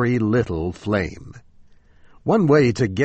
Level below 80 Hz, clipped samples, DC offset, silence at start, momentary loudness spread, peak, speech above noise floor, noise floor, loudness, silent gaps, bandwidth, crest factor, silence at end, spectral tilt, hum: -44 dBFS; under 0.1%; under 0.1%; 0 s; 13 LU; -4 dBFS; 30 dB; -49 dBFS; -20 LUFS; none; 8.4 kHz; 16 dB; 0 s; -7.5 dB/octave; none